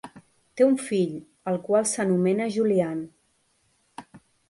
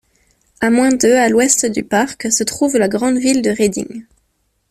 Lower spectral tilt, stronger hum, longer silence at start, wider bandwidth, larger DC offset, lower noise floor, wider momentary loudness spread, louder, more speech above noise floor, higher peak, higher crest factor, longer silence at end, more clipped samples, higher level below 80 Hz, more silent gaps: first, -5.5 dB/octave vs -3 dB/octave; neither; second, 0.05 s vs 0.6 s; second, 11.5 kHz vs 14 kHz; neither; about the same, -68 dBFS vs -65 dBFS; first, 21 LU vs 7 LU; second, -24 LUFS vs -14 LUFS; second, 45 dB vs 50 dB; second, -8 dBFS vs 0 dBFS; about the same, 18 dB vs 16 dB; second, 0.3 s vs 0.7 s; neither; second, -70 dBFS vs -52 dBFS; neither